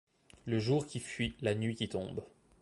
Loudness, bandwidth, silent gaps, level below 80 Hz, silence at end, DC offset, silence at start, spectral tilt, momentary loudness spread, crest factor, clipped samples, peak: -36 LUFS; 11.5 kHz; none; -60 dBFS; 0.35 s; under 0.1%; 0.45 s; -6 dB/octave; 11 LU; 18 dB; under 0.1%; -18 dBFS